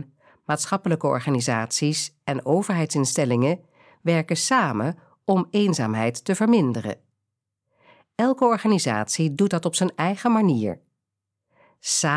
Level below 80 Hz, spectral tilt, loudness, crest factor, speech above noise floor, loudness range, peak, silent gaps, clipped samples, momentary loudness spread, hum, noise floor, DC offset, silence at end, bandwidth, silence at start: -70 dBFS; -5 dB/octave; -23 LUFS; 16 dB; 61 dB; 2 LU; -6 dBFS; none; under 0.1%; 10 LU; none; -83 dBFS; under 0.1%; 0 s; 11 kHz; 0 s